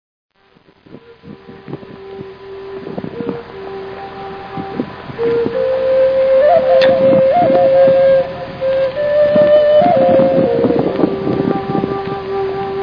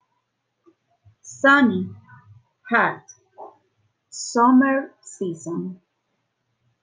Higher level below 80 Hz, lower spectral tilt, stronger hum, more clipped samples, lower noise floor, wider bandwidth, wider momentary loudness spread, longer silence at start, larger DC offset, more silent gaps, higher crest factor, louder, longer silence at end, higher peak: first, -48 dBFS vs -72 dBFS; first, -8.5 dB/octave vs -4.5 dB/octave; neither; neither; second, -51 dBFS vs -74 dBFS; second, 5.4 kHz vs 9.6 kHz; second, 19 LU vs 22 LU; second, 0.9 s vs 1.25 s; neither; neither; second, 14 dB vs 20 dB; first, -13 LUFS vs -20 LUFS; second, 0 s vs 1.1 s; first, 0 dBFS vs -4 dBFS